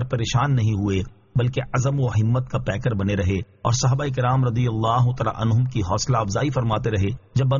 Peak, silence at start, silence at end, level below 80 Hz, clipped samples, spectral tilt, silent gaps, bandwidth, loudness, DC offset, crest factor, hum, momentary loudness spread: -8 dBFS; 0 s; 0 s; -42 dBFS; under 0.1%; -6.5 dB/octave; none; 7.4 kHz; -22 LUFS; under 0.1%; 14 dB; none; 4 LU